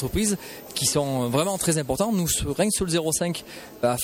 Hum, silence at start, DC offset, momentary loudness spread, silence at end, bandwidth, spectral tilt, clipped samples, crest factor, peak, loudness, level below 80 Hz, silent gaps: none; 0 s; under 0.1%; 8 LU; 0 s; 17 kHz; -4 dB/octave; under 0.1%; 16 dB; -10 dBFS; -24 LUFS; -44 dBFS; none